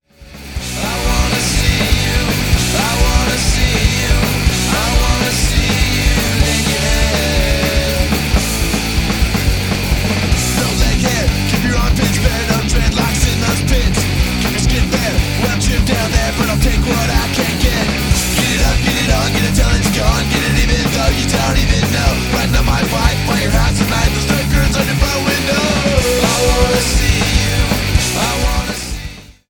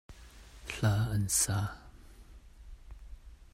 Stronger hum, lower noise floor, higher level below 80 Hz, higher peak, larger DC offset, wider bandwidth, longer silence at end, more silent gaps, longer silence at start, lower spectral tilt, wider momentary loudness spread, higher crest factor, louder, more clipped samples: neither; second, -34 dBFS vs -53 dBFS; first, -18 dBFS vs -50 dBFS; first, 0 dBFS vs -16 dBFS; neither; about the same, 17.5 kHz vs 16 kHz; about the same, 0.2 s vs 0.1 s; neither; about the same, 0.2 s vs 0.1 s; about the same, -4 dB/octave vs -4 dB/octave; second, 2 LU vs 26 LU; about the same, 14 dB vs 18 dB; first, -14 LUFS vs -31 LUFS; neither